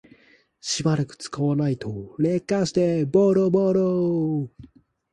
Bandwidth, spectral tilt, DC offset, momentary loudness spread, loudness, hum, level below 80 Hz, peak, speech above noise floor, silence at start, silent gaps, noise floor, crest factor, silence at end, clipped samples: 11 kHz; -6.5 dB/octave; under 0.1%; 11 LU; -23 LUFS; none; -58 dBFS; -6 dBFS; 36 dB; 0.65 s; none; -58 dBFS; 18 dB; 0.5 s; under 0.1%